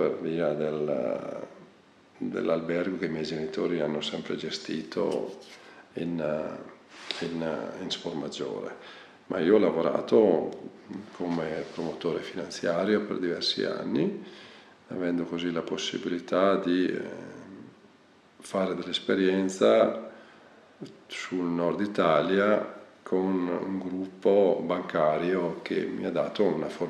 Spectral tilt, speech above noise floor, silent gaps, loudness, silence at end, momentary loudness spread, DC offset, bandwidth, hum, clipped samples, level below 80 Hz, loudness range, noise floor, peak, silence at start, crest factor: -5.5 dB/octave; 30 dB; none; -28 LUFS; 0 s; 19 LU; under 0.1%; 11 kHz; none; under 0.1%; -70 dBFS; 6 LU; -58 dBFS; -8 dBFS; 0 s; 20 dB